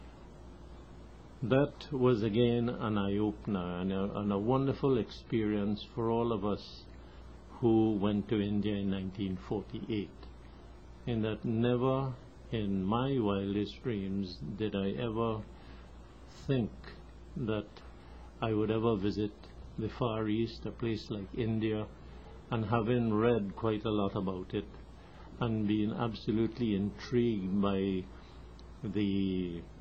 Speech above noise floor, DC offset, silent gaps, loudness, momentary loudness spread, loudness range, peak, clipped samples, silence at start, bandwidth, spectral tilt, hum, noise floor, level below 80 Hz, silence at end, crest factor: 20 dB; under 0.1%; none; -33 LUFS; 22 LU; 5 LU; -14 dBFS; under 0.1%; 0 s; 7.4 kHz; -8.5 dB/octave; none; -52 dBFS; -52 dBFS; 0 s; 20 dB